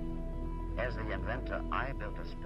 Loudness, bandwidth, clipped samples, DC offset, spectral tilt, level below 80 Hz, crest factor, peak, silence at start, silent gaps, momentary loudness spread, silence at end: -38 LUFS; 6 kHz; under 0.1%; under 0.1%; -8 dB/octave; -40 dBFS; 14 dB; -22 dBFS; 0 s; none; 5 LU; 0 s